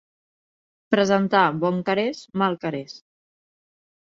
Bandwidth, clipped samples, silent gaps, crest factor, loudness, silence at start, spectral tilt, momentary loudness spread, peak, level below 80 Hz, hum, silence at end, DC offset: 7.6 kHz; under 0.1%; none; 22 dB; -22 LUFS; 0.9 s; -6 dB/octave; 11 LU; -2 dBFS; -66 dBFS; none; 1.1 s; under 0.1%